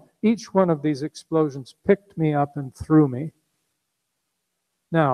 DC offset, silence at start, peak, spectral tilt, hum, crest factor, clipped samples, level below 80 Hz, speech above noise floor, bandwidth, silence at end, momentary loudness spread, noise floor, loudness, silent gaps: under 0.1%; 0.25 s; -4 dBFS; -8 dB/octave; none; 20 dB; under 0.1%; -56 dBFS; 56 dB; 10.5 kHz; 0 s; 11 LU; -77 dBFS; -23 LUFS; none